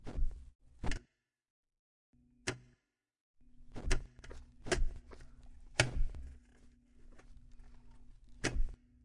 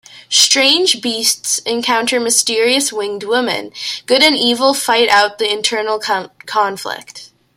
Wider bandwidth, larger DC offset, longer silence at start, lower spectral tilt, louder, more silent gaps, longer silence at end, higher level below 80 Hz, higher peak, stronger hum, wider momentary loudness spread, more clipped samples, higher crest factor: second, 11.5 kHz vs 16.5 kHz; neither; about the same, 0 s vs 0.1 s; first, -3.5 dB/octave vs -0.5 dB/octave; second, -40 LUFS vs -13 LUFS; first, 0.55-0.59 s, 1.50-1.63 s, 1.79-2.13 s, 3.21-3.34 s vs none; about the same, 0.3 s vs 0.3 s; first, -42 dBFS vs -62 dBFS; second, -12 dBFS vs 0 dBFS; neither; first, 26 LU vs 11 LU; neither; first, 26 dB vs 16 dB